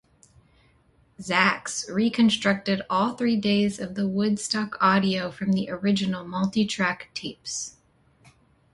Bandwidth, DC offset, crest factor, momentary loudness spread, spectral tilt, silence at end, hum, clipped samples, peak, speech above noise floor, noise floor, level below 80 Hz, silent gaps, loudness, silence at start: 11.5 kHz; under 0.1%; 22 dB; 11 LU; -4.5 dB/octave; 1.05 s; none; under 0.1%; -4 dBFS; 37 dB; -61 dBFS; -62 dBFS; none; -24 LUFS; 1.2 s